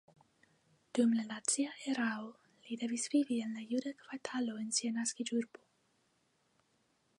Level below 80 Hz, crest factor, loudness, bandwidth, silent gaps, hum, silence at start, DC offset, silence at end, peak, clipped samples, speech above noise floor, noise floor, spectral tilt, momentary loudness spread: -88 dBFS; 18 dB; -36 LUFS; 11.5 kHz; none; none; 0.95 s; under 0.1%; 1.7 s; -20 dBFS; under 0.1%; 40 dB; -76 dBFS; -2.5 dB/octave; 12 LU